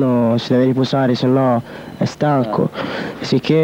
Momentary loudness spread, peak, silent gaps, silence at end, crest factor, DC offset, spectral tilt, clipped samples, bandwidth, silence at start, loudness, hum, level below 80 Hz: 9 LU; -2 dBFS; none; 0 s; 14 dB; under 0.1%; -7.5 dB/octave; under 0.1%; 9.4 kHz; 0 s; -17 LUFS; none; -54 dBFS